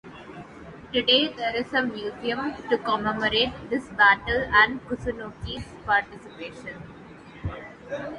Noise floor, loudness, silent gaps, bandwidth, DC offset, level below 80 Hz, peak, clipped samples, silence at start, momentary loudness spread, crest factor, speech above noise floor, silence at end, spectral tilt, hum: -45 dBFS; -23 LUFS; none; 11 kHz; under 0.1%; -48 dBFS; -4 dBFS; under 0.1%; 0.05 s; 23 LU; 22 dB; 20 dB; 0 s; -5 dB/octave; none